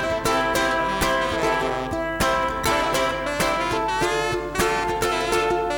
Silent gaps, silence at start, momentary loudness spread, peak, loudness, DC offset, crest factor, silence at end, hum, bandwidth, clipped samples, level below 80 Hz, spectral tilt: none; 0 s; 3 LU; -8 dBFS; -22 LUFS; under 0.1%; 14 dB; 0 s; none; 19.5 kHz; under 0.1%; -40 dBFS; -3.5 dB/octave